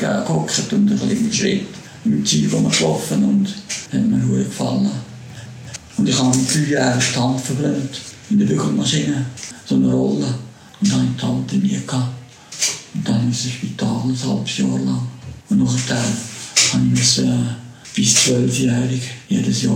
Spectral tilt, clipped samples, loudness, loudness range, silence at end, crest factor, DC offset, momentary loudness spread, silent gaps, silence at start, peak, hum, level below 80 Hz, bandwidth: -4.5 dB/octave; under 0.1%; -18 LUFS; 5 LU; 0 s; 18 dB; under 0.1%; 13 LU; none; 0 s; 0 dBFS; none; -50 dBFS; 16.5 kHz